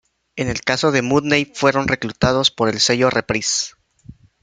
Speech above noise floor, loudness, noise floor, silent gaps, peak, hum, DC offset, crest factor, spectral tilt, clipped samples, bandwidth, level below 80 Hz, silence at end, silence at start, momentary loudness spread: 26 dB; -18 LUFS; -44 dBFS; none; 0 dBFS; none; under 0.1%; 20 dB; -3.5 dB/octave; under 0.1%; 9.6 kHz; -44 dBFS; 0.3 s; 0.35 s; 7 LU